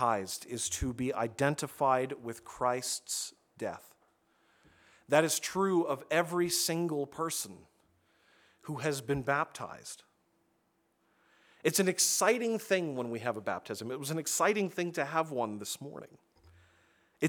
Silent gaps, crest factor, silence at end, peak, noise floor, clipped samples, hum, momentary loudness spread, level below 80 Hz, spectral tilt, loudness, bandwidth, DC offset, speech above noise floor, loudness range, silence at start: none; 24 dB; 0 s; -10 dBFS; -75 dBFS; under 0.1%; none; 14 LU; -60 dBFS; -3.5 dB/octave; -32 LUFS; over 20 kHz; under 0.1%; 42 dB; 7 LU; 0 s